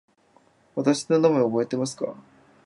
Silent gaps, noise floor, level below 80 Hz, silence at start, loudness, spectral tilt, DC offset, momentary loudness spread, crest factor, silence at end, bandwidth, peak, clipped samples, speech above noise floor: none; -61 dBFS; -72 dBFS; 0.75 s; -24 LUFS; -6 dB/octave; under 0.1%; 13 LU; 18 dB; 0.45 s; 11.5 kHz; -8 dBFS; under 0.1%; 38 dB